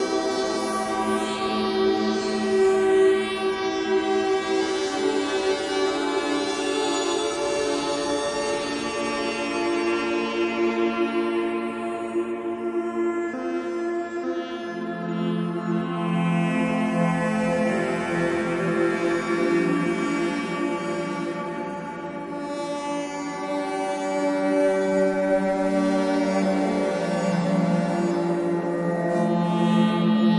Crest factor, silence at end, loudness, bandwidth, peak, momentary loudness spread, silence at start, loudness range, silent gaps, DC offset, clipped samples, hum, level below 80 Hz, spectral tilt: 14 dB; 0 s; -24 LUFS; 11.5 kHz; -10 dBFS; 7 LU; 0 s; 5 LU; none; under 0.1%; under 0.1%; none; -58 dBFS; -5.5 dB/octave